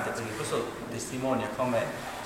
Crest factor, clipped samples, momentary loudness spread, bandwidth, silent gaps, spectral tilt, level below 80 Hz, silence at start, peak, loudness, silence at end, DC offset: 16 dB; under 0.1%; 6 LU; 16 kHz; none; -4.5 dB/octave; -58 dBFS; 0 s; -16 dBFS; -31 LUFS; 0 s; under 0.1%